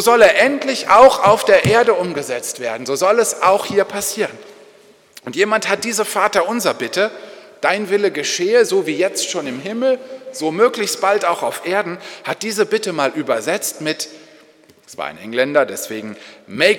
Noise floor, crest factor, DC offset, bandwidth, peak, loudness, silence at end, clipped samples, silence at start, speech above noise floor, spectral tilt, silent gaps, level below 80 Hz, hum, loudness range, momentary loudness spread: -49 dBFS; 16 dB; under 0.1%; 19 kHz; 0 dBFS; -16 LUFS; 0 s; under 0.1%; 0 s; 32 dB; -3 dB/octave; none; -56 dBFS; none; 7 LU; 15 LU